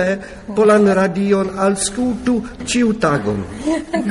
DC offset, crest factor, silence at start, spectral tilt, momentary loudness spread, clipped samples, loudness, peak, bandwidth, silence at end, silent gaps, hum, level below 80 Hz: under 0.1%; 14 dB; 0 s; -5 dB/octave; 9 LU; under 0.1%; -17 LUFS; -2 dBFS; 11.5 kHz; 0 s; none; none; -42 dBFS